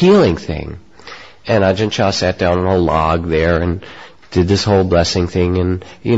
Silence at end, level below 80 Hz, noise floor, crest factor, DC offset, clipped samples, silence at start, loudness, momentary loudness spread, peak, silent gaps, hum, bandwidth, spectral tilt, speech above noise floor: 0 s; -28 dBFS; -37 dBFS; 14 dB; 0.6%; under 0.1%; 0 s; -15 LUFS; 18 LU; -2 dBFS; none; none; 8 kHz; -6 dB/octave; 23 dB